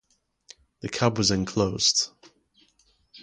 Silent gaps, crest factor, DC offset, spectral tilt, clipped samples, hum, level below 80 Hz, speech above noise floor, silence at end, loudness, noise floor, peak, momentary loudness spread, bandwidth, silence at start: none; 22 dB; under 0.1%; -3.5 dB/octave; under 0.1%; none; -52 dBFS; 41 dB; 0 s; -24 LUFS; -65 dBFS; -6 dBFS; 12 LU; 11 kHz; 0.85 s